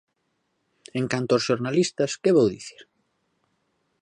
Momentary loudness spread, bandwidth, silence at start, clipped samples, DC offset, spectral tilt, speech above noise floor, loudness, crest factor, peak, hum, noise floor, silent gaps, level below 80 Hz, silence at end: 14 LU; 11 kHz; 0.95 s; under 0.1%; under 0.1%; -5 dB/octave; 51 dB; -23 LUFS; 18 dB; -8 dBFS; none; -74 dBFS; none; -66 dBFS; 1.2 s